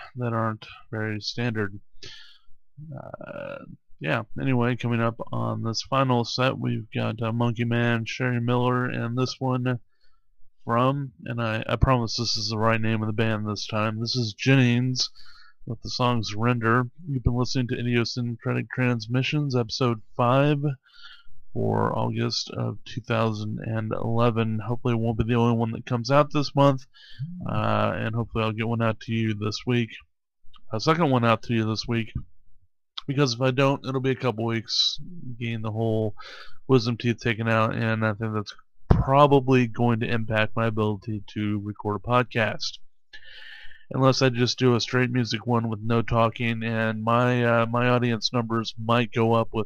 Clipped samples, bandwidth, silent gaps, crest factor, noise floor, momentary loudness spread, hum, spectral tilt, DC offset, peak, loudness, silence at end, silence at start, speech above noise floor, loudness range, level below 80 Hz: under 0.1%; 7.2 kHz; none; 22 dB; -55 dBFS; 12 LU; none; -6 dB/octave; under 0.1%; -4 dBFS; -25 LUFS; 0 s; 0 s; 31 dB; 5 LU; -44 dBFS